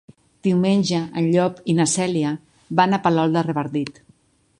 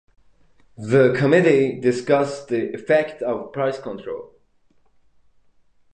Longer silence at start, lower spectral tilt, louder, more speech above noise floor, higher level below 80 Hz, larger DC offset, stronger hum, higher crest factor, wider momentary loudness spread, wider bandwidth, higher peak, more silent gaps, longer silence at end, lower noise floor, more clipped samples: second, 0.45 s vs 0.8 s; second, -5.5 dB/octave vs -7 dB/octave; about the same, -20 LUFS vs -20 LUFS; about the same, 38 dB vs 39 dB; about the same, -60 dBFS vs -64 dBFS; neither; neither; about the same, 18 dB vs 18 dB; second, 8 LU vs 16 LU; first, 11 kHz vs 9.4 kHz; about the same, -2 dBFS vs -2 dBFS; neither; second, 0.7 s vs 1.65 s; about the same, -57 dBFS vs -58 dBFS; neither